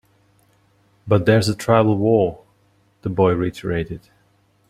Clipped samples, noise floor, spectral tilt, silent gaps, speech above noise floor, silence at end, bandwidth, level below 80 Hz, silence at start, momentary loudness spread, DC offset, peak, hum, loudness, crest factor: under 0.1%; -60 dBFS; -7 dB/octave; none; 42 dB; 0.7 s; 15 kHz; -48 dBFS; 1.05 s; 12 LU; under 0.1%; -2 dBFS; none; -19 LUFS; 20 dB